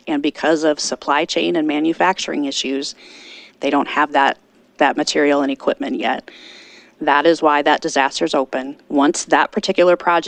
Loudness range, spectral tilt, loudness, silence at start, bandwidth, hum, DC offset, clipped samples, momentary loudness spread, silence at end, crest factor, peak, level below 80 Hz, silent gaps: 3 LU; -3 dB/octave; -17 LUFS; 0.05 s; 10 kHz; none; under 0.1%; under 0.1%; 10 LU; 0 s; 18 dB; 0 dBFS; -62 dBFS; none